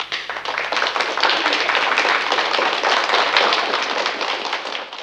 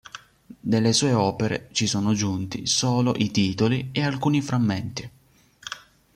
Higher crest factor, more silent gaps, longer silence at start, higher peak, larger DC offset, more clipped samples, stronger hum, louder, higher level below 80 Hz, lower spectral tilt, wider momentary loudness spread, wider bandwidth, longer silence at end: about the same, 20 dB vs 16 dB; neither; second, 0 s vs 0.15 s; first, 0 dBFS vs -8 dBFS; neither; neither; neither; first, -18 LUFS vs -23 LUFS; second, -64 dBFS vs -56 dBFS; second, -0.5 dB/octave vs -4.5 dB/octave; second, 8 LU vs 17 LU; about the same, 15 kHz vs 15 kHz; second, 0 s vs 0.4 s